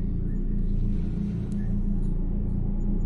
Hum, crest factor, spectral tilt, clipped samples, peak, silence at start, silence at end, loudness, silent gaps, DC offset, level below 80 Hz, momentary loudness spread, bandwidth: none; 10 dB; -10.5 dB/octave; under 0.1%; -16 dBFS; 0 s; 0 s; -30 LUFS; none; under 0.1%; -26 dBFS; 1 LU; 2.3 kHz